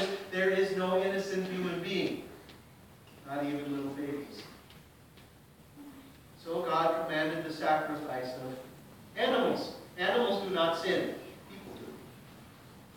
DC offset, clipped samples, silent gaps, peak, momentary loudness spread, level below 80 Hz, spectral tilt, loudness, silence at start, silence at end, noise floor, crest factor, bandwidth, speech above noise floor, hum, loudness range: under 0.1%; under 0.1%; none; -14 dBFS; 23 LU; -68 dBFS; -5 dB/octave; -32 LUFS; 0 s; 0 s; -57 dBFS; 20 dB; 18 kHz; 25 dB; none; 9 LU